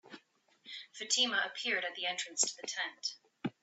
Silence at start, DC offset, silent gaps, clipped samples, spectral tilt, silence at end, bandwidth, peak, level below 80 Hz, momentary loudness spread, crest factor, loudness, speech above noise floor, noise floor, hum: 0.05 s; under 0.1%; none; under 0.1%; 0 dB/octave; 0.1 s; 8.4 kHz; -14 dBFS; -84 dBFS; 15 LU; 24 dB; -34 LUFS; 32 dB; -68 dBFS; none